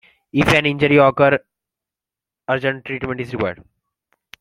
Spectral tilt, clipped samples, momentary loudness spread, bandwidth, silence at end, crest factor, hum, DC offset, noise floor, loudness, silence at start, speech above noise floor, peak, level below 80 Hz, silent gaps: -6 dB/octave; under 0.1%; 12 LU; 15.5 kHz; 0.85 s; 18 dB; none; under 0.1%; -88 dBFS; -17 LUFS; 0.35 s; 71 dB; -2 dBFS; -48 dBFS; none